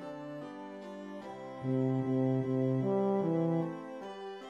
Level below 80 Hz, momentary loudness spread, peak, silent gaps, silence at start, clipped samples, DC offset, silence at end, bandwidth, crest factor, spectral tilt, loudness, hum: -76 dBFS; 14 LU; -20 dBFS; none; 0 s; under 0.1%; under 0.1%; 0 s; 7.4 kHz; 12 dB; -9.5 dB/octave; -33 LUFS; none